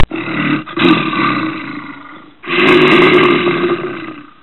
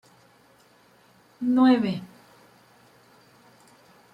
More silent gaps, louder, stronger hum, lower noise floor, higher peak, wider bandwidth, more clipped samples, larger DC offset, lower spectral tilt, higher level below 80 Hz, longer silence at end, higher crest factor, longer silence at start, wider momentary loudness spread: neither; first, -11 LUFS vs -23 LUFS; neither; second, -35 dBFS vs -58 dBFS; first, 0 dBFS vs -8 dBFS; first, 8 kHz vs 5.6 kHz; neither; neither; about the same, -6.5 dB/octave vs -7 dB/octave; first, -32 dBFS vs -74 dBFS; second, 0.2 s vs 2.1 s; second, 12 dB vs 20 dB; second, 0 s vs 1.4 s; about the same, 20 LU vs 18 LU